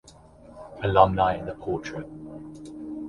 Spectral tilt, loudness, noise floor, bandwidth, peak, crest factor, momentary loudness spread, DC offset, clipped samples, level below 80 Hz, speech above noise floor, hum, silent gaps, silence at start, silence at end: -7 dB/octave; -24 LUFS; -50 dBFS; 11 kHz; -2 dBFS; 24 dB; 21 LU; under 0.1%; under 0.1%; -46 dBFS; 27 dB; none; none; 0.05 s; 0 s